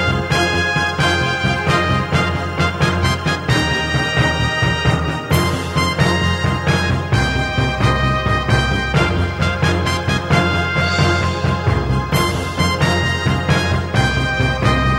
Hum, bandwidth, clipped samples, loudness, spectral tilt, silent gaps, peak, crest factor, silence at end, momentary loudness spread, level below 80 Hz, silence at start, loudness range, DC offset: none; 16 kHz; under 0.1%; -17 LUFS; -5 dB/octave; none; 0 dBFS; 16 dB; 0 s; 3 LU; -28 dBFS; 0 s; 0 LU; under 0.1%